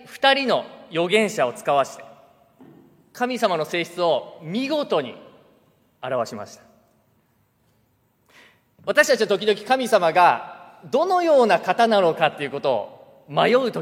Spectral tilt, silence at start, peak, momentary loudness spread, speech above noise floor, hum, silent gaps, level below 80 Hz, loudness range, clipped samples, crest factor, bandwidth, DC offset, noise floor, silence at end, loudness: -4 dB/octave; 0.1 s; -2 dBFS; 12 LU; 44 dB; none; none; -72 dBFS; 12 LU; under 0.1%; 20 dB; 16.5 kHz; under 0.1%; -64 dBFS; 0 s; -21 LUFS